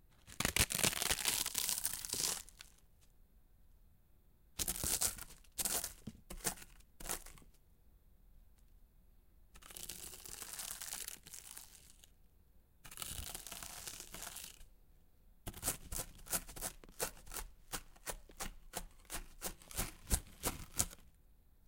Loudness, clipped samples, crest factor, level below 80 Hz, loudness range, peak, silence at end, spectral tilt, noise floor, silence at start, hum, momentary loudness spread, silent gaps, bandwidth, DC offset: -40 LUFS; under 0.1%; 34 dB; -54 dBFS; 10 LU; -10 dBFS; 0.25 s; -1 dB/octave; -67 dBFS; 0.1 s; none; 19 LU; none; 17 kHz; under 0.1%